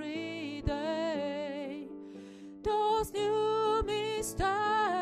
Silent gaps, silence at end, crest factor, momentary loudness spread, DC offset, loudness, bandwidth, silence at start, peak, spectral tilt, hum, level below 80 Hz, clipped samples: none; 0 s; 14 dB; 15 LU; under 0.1%; -32 LUFS; 15.5 kHz; 0 s; -18 dBFS; -4.5 dB/octave; none; -50 dBFS; under 0.1%